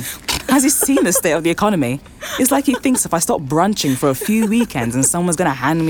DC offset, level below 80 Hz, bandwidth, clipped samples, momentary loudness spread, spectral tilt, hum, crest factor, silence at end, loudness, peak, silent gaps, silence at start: under 0.1%; -44 dBFS; 19 kHz; under 0.1%; 6 LU; -4 dB/octave; none; 14 dB; 0 s; -16 LUFS; -2 dBFS; none; 0 s